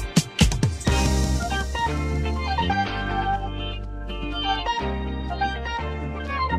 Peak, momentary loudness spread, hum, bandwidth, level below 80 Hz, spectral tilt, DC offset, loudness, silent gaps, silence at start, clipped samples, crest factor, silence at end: -4 dBFS; 9 LU; none; 14.5 kHz; -30 dBFS; -4.5 dB/octave; under 0.1%; -25 LUFS; none; 0 s; under 0.1%; 20 dB; 0 s